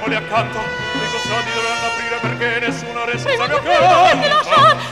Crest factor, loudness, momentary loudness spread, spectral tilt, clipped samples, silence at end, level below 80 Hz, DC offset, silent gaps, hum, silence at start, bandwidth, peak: 14 dB; -16 LUFS; 10 LU; -3.5 dB/octave; under 0.1%; 0 s; -48 dBFS; 0.2%; none; none; 0 s; 13.5 kHz; -2 dBFS